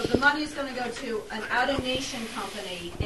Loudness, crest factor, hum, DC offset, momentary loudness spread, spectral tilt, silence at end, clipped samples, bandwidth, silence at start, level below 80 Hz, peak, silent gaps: -28 LUFS; 22 dB; none; 0.3%; 11 LU; -4 dB/octave; 0 s; under 0.1%; 12.5 kHz; 0 s; -50 dBFS; -6 dBFS; none